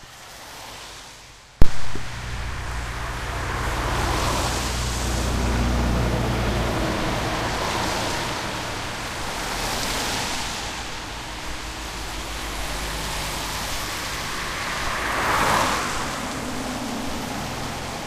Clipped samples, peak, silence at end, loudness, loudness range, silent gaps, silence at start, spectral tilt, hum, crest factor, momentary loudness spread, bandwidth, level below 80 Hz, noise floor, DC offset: under 0.1%; 0 dBFS; 0 s; -26 LUFS; 5 LU; none; 0 s; -3.5 dB/octave; none; 22 dB; 9 LU; 15.5 kHz; -32 dBFS; -45 dBFS; under 0.1%